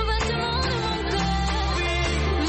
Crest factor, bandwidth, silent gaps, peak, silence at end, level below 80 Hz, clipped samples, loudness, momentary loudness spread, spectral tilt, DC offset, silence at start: 12 dB; 8.8 kHz; none; -12 dBFS; 0 s; -28 dBFS; under 0.1%; -24 LUFS; 1 LU; -5 dB/octave; under 0.1%; 0 s